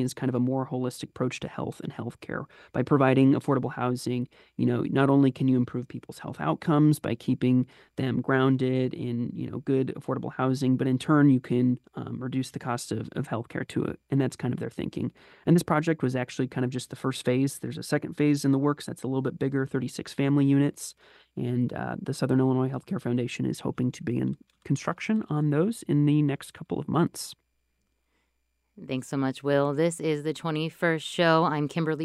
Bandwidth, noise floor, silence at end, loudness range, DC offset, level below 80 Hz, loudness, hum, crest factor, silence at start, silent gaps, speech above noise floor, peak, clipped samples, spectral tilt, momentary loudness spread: 12.5 kHz; -75 dBFS; 0 s; 4 LU; under 0.1%; -64 dBFS; -27 LUFS; none; 18 dB; 0 s; none; 49 dB; -8 dBFS; under 0.1%; -7 dB/octave; 12 LU